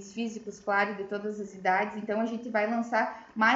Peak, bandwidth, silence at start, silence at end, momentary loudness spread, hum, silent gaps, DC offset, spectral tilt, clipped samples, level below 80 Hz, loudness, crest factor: -10 dBFS; 7.8 kHz; 0 s; 0 s; 8 LU; none; none; under 0.1%; -5 dB/octave; under 0.1%; -72 dBFS; -30 LUFS; 20 dB